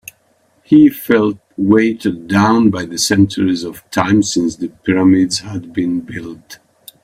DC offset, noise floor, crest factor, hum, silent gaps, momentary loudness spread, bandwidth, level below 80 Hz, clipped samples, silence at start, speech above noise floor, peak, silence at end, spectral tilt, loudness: under 0.1%; -57 dBFS; 14 dB; none; none; 11 LU; 15.5 kHz; -50 dBFS; under 0.1%; 0.7 s; 43 dB; 0 dBFS; 0.5 s; -5 dB/octave; -14 LUFS